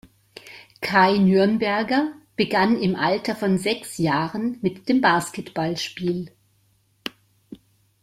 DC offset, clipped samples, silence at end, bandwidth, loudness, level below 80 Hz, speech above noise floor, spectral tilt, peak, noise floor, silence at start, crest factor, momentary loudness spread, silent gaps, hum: under 0.1%; under 0.1%; 0.5 s; 15.5 kHz; -22 LUFS; -60 dBFS; 42 dB; -5.5 dB/octave; -2 dBFS; -63 dBFS; 0.45 s; 20 dB; 18 LU; none; none